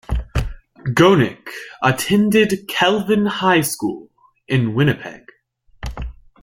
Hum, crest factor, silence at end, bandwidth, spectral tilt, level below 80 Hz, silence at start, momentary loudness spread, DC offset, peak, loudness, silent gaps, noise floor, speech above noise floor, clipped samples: none; 18 dB; 0.3 s; 16.5 kHz; -5.5 dB/octave; -34 dBFS; 0.1 s; 19 LU; under 0.1%; -2 dBFS; -17 LUFS; none; -55 dBFS; 38 dB; under 0.1%